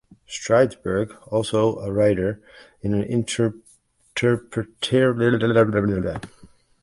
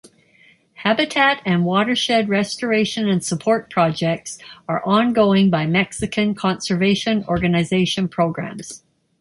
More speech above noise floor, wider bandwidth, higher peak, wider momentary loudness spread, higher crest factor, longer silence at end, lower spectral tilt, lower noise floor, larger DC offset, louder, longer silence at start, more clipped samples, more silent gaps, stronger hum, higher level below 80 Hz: about the same, 36 dB vs 35 dB; about the same, 11.5 kHz vs 11.5 kHz; about the same, -4 dBFS vs -2 dBFS; about the same, 12 LU vs 10 LU; about the same, 18 dB vs 16 dB; about the same, 0.35 s vs 0.45 s; about the same, -6 dB/octave vs -5 dB/octave; about the same, -57 dBFS vs -54 dBFS; neither; second, -22 LUFS vs -19 LUFS; second, 0.3 s vs 0.8 s; neither; neither; neither; about the same, -48 dBFS vs -50 dBFS